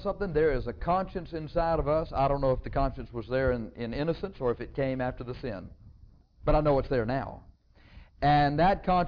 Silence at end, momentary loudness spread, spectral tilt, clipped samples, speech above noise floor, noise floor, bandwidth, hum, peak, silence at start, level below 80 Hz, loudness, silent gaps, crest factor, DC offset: 0 s; 13 LU; -9.5 dB/octave; under 0.1%; 27 dB; -55 dBFS; 5.4 kHz; none; -12 dBFS; 0 s; -40 dBFS; -29 LUFS; none; 16 dB; under 0.1%